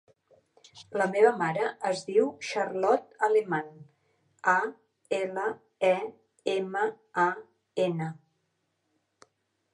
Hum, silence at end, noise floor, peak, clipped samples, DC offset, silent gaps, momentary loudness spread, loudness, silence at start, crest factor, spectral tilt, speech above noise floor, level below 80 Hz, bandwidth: none; 1.6 s; -77 dBFS; -8 dBFS; under 0.1%; under 0.1%; none; 12 LU; -28 LUFS; 0.75 s; 22 dB; -5 dB/octave; 49 dB; -82 dBFS; 10.5 kHz